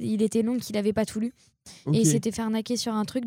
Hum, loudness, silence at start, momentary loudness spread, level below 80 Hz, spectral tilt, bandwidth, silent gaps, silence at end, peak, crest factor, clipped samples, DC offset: none; -26 LUFS; 0 s; 8 LU; -60 dBFS; -5.5 dB/octave; 16.5 kHz; none; 0 s; -10 dBFS; 18 dB; under 0.1%; under 0.1%